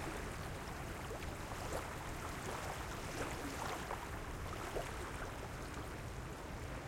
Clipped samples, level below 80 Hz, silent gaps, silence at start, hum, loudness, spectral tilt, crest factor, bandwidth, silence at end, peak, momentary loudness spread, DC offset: under 0.1%; -52 dBFS; none; 0 s; none; -45 LUFS; -4.5 dB/octave; 18 dB; 16.5 kHz; 0 s; -28 dBFS; 4 LU; under 0.1%